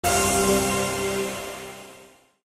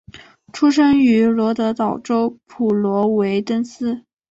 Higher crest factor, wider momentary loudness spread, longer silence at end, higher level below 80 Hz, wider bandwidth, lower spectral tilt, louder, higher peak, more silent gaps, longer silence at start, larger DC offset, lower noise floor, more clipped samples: first, 18 dB vs 12 dB; first, 18 LU vs 11 LU; about the same, 0.4 s vs 0.35 s; first, -44 dBFS vs -56 dBFS; first, 15 kHz vs 8 kHz; second, -3 dB/octave vs -6.5 dB/octave; second, -23 LUFS vs -18 LUFS; about the same, -8 dBFS vs -6 dBFS; neither; about the same, 0.05 s vs 0.15 s; neither; first, -51 dBFS vs -43 dBFS; neither